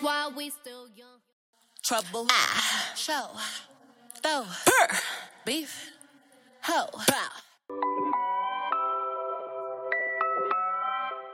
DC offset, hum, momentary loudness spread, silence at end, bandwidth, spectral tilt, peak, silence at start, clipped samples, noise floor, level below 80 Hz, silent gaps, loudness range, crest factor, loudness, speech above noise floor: under 0.1%; none; 16 LU; 0 s; 16 kHz; -1 dB/octave; -6 dBFS; 0 s; under 0.1%; -59 dBFS; -78 dBFS; 1.33-1.53 s; 4 LU; 26 dB; -28 LUFS; 30 dB